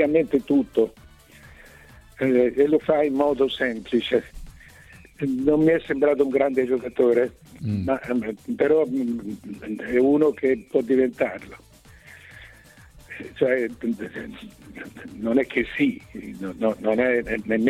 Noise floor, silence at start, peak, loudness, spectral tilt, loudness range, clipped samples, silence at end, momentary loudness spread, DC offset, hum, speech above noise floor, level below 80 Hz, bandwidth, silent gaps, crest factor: -49 dBFS; 0 s; -6 dBFS; -23 LUFS; -7 dB/octave; 6 LU; under 0.1%; 0 s; 18 LU; under 0.1%; none; 27 dB; -52 dBFS; 14.5 kHz; none; 16 dB